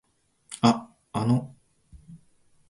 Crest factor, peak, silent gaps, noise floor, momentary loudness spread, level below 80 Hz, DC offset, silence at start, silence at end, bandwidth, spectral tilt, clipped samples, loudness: 24 dB; -4 dBFS; none; -61 dBFS; 18 LU; -58 dBFS; under 0.1%; 0.5 s; 0.55 s; 11.5 kHz; -6.5 dB/octave; under 0.1%; -26 LUFS